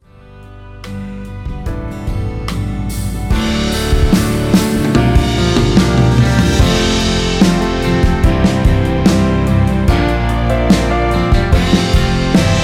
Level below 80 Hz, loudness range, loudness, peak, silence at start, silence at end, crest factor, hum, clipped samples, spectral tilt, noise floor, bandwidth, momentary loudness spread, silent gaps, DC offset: -18 dBFS; 7 LU; -13 LUFS; 0 dBFS; 0.3 s; 0 s; 12 dB; none; under 0.1%; -6 dB/octave; -37 dBFS; 16.5 kHz; 11 LU; none; under 0.1%